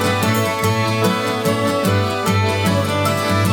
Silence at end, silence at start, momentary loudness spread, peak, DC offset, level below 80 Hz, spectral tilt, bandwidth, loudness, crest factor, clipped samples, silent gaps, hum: 0 s; 0 s; 1 LU; -6 dBFS; under 0.1%; -52 dBFS; -5 dB/octave; 19 kHz; -17 LUFS; 12 dB; under 0.1%; none; none